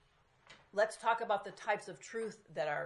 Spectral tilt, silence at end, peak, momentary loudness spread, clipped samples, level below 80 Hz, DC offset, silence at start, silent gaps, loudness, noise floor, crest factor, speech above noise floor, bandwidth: -3.5 dB/octave; 0 s; -18 dBFS; 9 LU; under 0.1%; -80 dBFS; under 0.1%; 0.5 s; none; -37 LUFS; -68 dBFS; 20 dB; 31 dB; 11.5 kHz